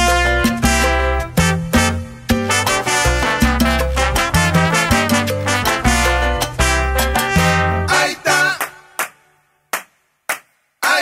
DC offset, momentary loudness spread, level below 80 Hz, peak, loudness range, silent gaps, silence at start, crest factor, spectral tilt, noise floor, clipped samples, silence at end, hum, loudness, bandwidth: under 0.1%; 11 LU; -24 dBFS; -2 dBFS; 3 LU; none; 0 s; 16 dB; -4 dB/octave; -58 dBFS; under 0.1%; 0 s; none; -16 LUFS; 16.5 kHz